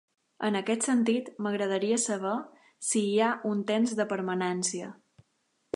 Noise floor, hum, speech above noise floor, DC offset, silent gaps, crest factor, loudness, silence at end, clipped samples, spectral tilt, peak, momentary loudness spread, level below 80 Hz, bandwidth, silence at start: -75 dBFS; none; 46 dB; under 0.1%; none; 18 dB; -29 LUFS; 0.85 s; under 0.1%; -4 dB/octave; -12 dBFS; 8 LU; -80 dBFS; 11.5 kHz; 0.4 s